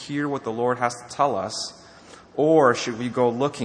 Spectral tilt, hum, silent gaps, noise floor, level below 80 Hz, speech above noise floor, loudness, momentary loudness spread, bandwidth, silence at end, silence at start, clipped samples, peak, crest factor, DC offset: -5 dB/octave; none; none; -47 dBFS; -64 dBFS; 25 dB; -23 LUFS; 12 LU; 10 kHz; 0 s; 0 s; under 0.1%; -4 dBFS; 20 dB; under 0.1%